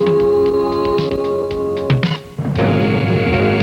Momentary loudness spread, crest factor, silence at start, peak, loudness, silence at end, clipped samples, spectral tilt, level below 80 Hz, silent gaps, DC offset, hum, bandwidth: 6 LU; 14 dB; 0 s; -2 dBFS; -16 LUFS; 0 s; under 0.1%; -8 dB/octave; -38 dBFS; none; under 0.1%; none; 10.5 kHz